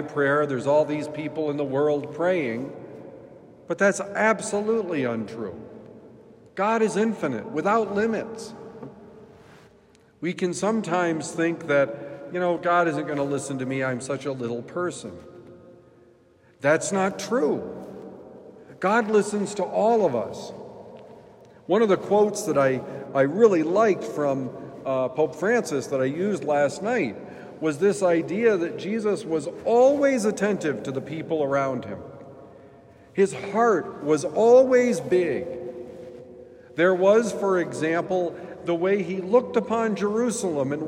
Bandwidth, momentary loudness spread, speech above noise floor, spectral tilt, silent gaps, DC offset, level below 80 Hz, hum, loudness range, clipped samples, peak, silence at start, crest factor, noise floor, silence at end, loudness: 14 kHz; 17 LU; 34 dB; -5.5 dB/octave; none; under 0.1%; -70 dBFS; none; 6 LU; under 0.1%; -4 dBFS; 0 s; 20 dB; -57 dBFS; 0 s; -24 LUFS